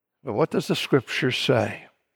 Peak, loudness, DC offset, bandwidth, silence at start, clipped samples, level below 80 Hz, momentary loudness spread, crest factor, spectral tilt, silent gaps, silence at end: -8 dBFS; -24 LUFS; under 0.1%; 18 kHz; 0.25 s; under 0.1%; -66 dBFS; 9 LU; 18 dB; -5 dB/octave; none; 0.3 s